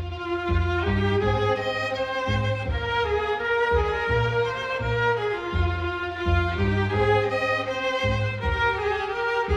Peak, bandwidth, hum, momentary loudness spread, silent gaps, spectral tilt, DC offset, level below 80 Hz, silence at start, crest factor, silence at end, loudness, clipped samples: -10 dBFS; 9 kHz; none; 4 LU; none; -6.5 dB/octave; under 0.1%; -34 dBFS; 0 s; 14 dB; 0 s; -24 LUFS; under 0.1%